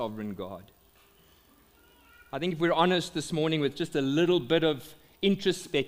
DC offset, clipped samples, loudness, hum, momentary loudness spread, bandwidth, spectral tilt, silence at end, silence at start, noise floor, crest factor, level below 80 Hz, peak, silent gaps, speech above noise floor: under 0.1%; under 0.1%; -28 LUFS; none; 13 LU; 16 kHz; -5.5 dB/octave; 0 s; 0 s; -61 dBFS; 20 dB; -62 dBFS; -10 dBFS; none; 33 dB